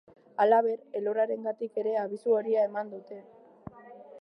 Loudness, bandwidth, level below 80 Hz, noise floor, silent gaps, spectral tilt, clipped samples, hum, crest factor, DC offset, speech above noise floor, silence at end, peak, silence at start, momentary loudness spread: -28 LUFS; 9.4 kHz; -72 dBFS; -49 dBFS; none; -7 dB/octave; under 0.1%; none; 18 dB; under 0.1%; 21 dB; 0 s; -10 dBFS; 0.4 s; 24 LU